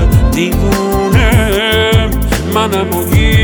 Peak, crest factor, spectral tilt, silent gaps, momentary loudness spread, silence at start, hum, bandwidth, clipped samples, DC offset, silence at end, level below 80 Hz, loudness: 0 dBFS; 10 dB; -5.5 dB/octave; none; 4 LU; 0 s; none; over 20 kHz; under 0.1%; under 0.1%; 0 s; -16 dBFS; -11 LUFS